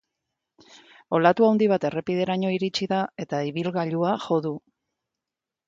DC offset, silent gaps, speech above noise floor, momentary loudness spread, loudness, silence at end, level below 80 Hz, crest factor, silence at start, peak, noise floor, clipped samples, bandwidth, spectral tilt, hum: under 0.1%; none; 65 dB; 9 LU; -24 LUFS; 1.1 s; -68 dBFS; 20 dB; 1.1 s; -4 dBFS; -88 dBFS; under 0.1%; 7.8 kHz; -6.5 dB/octave; none